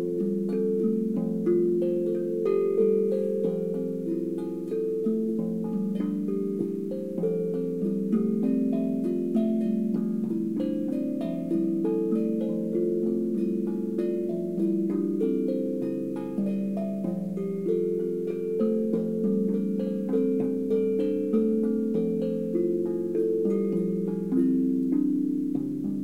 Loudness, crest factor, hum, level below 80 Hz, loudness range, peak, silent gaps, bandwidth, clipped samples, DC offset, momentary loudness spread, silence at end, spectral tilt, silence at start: -27 LUFS; 14 dB; none; -66 dBFS; 3 LU; -14 dBFS; none; 15 kHz; under 0.1%; 0.2%; 5 LU; 0 s; -10 dB/octave; 0 s